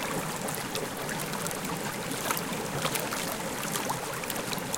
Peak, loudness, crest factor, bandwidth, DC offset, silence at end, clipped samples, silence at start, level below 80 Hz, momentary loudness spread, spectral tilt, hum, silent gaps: -8 dBFS; -32 LUFS; 26 dB; 17 kHz; under 0.1%; 0 s; under 0.1%; 0 s; -58 dBFS; 3 LU; -3 dB/octave; none; none